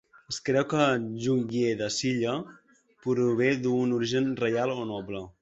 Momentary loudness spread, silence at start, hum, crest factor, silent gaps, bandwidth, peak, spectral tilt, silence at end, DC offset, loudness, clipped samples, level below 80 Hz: 11 LU; 0.3 s; none; 18 dB; none; 8 kHz; -8 dBFS; -5.5 dB/octave; 0.1 s; under 0.1%; -27 LUFS; under 0.1%; -64 dBFS